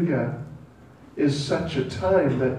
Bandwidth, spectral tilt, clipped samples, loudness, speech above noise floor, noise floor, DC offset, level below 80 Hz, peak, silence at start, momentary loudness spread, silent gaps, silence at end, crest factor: 11 kHz; -6.5 dB/octave; under 0.1%; -24 LUFS; 25 dB; -49 dBFS; under 0.1%; -48 dBFS; -8 dBFS; 0 s; 17 LU; none; 0 s; 16 dB